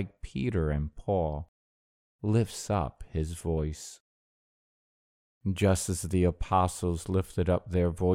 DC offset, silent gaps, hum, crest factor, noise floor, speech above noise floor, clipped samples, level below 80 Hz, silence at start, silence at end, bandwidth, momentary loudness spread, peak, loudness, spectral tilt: under 0.1%; 1.48-2.19 s, 4.00-5.41 s; none; 20 dB; under -90 dBFS; over 61 dB; under 0.1%; -42 dBFS; 0 s; 0 s; 16 kHz; 10 LU; -10 dBFS; -30 LUFS; -6.5 dB/octave